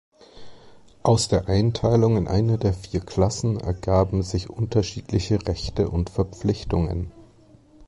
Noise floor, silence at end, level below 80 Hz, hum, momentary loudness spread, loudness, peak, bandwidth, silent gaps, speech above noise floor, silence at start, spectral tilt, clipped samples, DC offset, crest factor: -52 dBFS; 0 s; -36 dBFS; none; 8 LU; -23 LUFS; -6 dBFS; 11.5 kHz; none; 30 dB; 0.35 s; -6.5 dB/octave; under 0.1%; under 0.1%; 18 dB